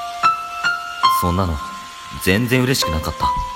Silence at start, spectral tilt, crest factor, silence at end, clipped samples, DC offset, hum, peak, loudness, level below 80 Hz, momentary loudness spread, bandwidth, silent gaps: 0 s; -4.5 dB/octave; 20 dB; 0 s; under 0.1%; under 0.1%; none; 0 dBFS; -18 LUFS; -34 dBFS; 11 LU; 16.5 kHz; none